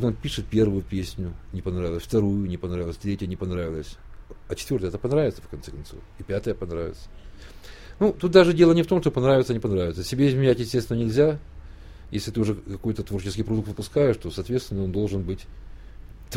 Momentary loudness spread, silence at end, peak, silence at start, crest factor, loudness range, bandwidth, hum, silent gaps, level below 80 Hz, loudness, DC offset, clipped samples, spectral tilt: 16 LU; 0 s; -2 dBFS; 0 s; 24 dB; 9 LU; 16.5 kHz; none; none; -42 dBFS; -24 LUFS; under 0.1%; under 0.1%; -7 dB/octave